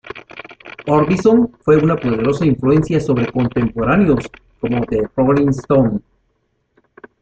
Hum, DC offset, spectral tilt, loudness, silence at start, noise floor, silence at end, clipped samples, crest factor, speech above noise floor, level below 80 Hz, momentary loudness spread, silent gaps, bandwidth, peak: none; under 0.1%; -8.5 dB/octave; -16 LUFS; 0.05 s; -65 dBFS; 1.2 s; under 0.1%; 16 dB; 51 dB; -40 dBFS; 16 LU; none; 8.4 kHz; 0 dBFS